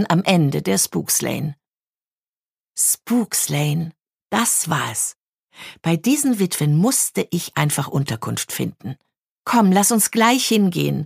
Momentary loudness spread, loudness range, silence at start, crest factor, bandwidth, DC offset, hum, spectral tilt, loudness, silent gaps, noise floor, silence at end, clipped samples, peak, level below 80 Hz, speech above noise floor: 12 LU; 3 LU; 0 s; 20 dB; 15.5 kHz; under 0.1%; none; -4 dB/octave; -19 LUFS; 1.89-1.93 s, 2.07-2.11 s, 2.27-2.42 s, 2.52-2.57 s, 5.16-5.33 s, 5.44-5.48 s, 9.19-9.36 s; under -90 dBFS; 0 s; under 0.1%; 0 dBFS; -62 dBFS; over 71 dB